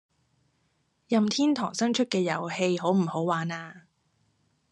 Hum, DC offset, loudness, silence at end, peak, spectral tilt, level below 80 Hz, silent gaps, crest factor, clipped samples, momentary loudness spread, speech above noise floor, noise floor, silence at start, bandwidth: none; under 0.1%; -27 LUFS; 0.95 s; -10 dBFS; -5 dB/octave; -76 dBFS; none; 20 dB; under 0.1%; 6 LU; 46 dB; -72 dBFS; 1.1 s; 10 kHz